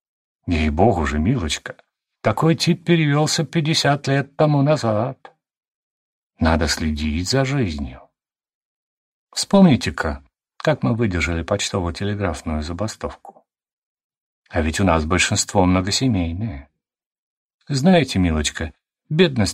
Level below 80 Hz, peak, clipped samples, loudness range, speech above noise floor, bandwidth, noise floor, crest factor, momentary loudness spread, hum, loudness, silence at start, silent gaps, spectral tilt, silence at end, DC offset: -34 dBFS; -2 dBFS; under 0.1%; 5 LU; 55 dB; 15.5 kHz; -74 dBFS; 18 dB; 11 LU; none; -19 LUFS; 0.45 s; 5.57-5.61 s, 5.68-6.30 s, 8.54-9.27 s, 13.72-13.97 s, 14.04-14.10 s, 14.17-14.42 s, 17.06-17.11 s, 17.18-17.59 s; -5 dB/octave; 0 s; under 0.1%